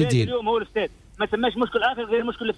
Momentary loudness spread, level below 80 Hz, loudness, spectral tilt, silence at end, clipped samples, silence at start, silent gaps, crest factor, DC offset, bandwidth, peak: 6 LU; -50 dBFS; -24 LUFS; -6 dB/octave; 0 s; under 0.1%; 0 s; none; 14 dB; under 0.1%; 11 kHz; -10 dBFS